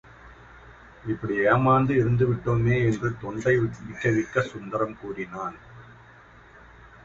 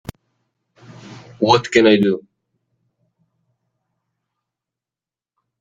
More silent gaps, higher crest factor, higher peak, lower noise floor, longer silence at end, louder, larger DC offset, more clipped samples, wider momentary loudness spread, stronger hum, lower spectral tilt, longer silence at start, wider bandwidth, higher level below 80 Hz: neither; about the same, 18 dB vs 20 dB; second, -8 dBFS vs -2 dBFS; second, -51 dBFS vs under -90 dBFS; second, 0.15 s vs 3.4 s; second, -25 LUFS vs -15 LUFS; neither; neither; about the same, 14 LU vs 14 LU; neither; first, -8 dB/octave vs -5.5 dB/octave; second, 0.25 s vs 1.05 s; second, 7.8 kHz vs 15 kHz; first, -50 dBFS vs -56 dBFS